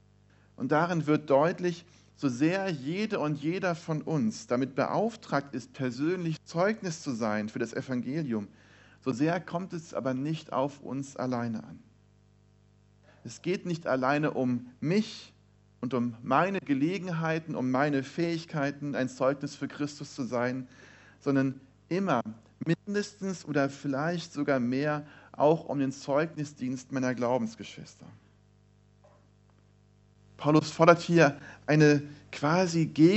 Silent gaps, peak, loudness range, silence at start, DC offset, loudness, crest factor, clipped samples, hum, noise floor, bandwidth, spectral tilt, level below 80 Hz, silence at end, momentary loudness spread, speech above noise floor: none; -4 dBFS; 7 LU; 0.6 s; under 0.1%; -30 LUFS; 26 dB; under 0.1%; 50 Hz at -60 dBFS; -62 dBFS; 8.2 kHz; -6.5 dB/octave; -70 dBFS; 0 s; 12 LU; 33 dB